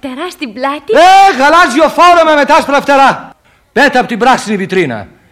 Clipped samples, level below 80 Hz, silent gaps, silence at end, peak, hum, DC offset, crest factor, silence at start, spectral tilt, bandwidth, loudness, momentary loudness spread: under 0.1%; -44 dBFS; none; 0.25 s; 0 dBFS; none; under 0.1%; 8 dB; 0.05 s; -3.5 dB/octave; 16 kHz; -8 LUFS; 13 LU